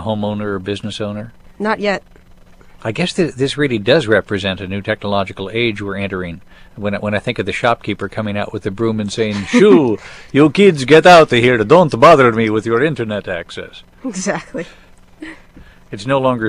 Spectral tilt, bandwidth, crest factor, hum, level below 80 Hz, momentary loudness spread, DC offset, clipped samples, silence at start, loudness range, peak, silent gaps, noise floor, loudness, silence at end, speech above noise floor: -5.5 dB/octave; 12 kHz; 14 dB; none; -44 dBFS; 19 LU; under 0.1%; 0.2%; 0 s; 11 LU; 0 dBFS; none; -42 dBFS; -14 LUFS; 0 s; 28 dB